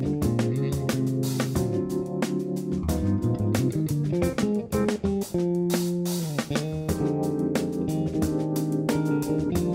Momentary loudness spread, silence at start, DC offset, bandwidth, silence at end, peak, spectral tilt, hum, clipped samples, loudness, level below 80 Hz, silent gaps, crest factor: 3 LU; 0 s; under 0.1%; 16.5 kHz; 0 s; -10 dBFS; -6.5 dB/octave; none; under 0.1%; -26 LUFS; -44 dBFS; none; 14 dB